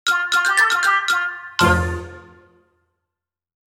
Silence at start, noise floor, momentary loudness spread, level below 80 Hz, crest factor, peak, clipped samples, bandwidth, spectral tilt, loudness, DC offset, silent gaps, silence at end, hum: 0.05 s; -84 dBFS; 11 LU; -40 dBFS; 18 dB; -2 dBFS; under 0.1%; 18.5 kHz; -3 dB/octave; -17 LUFS; under 0.1%; none; 1.55 s; none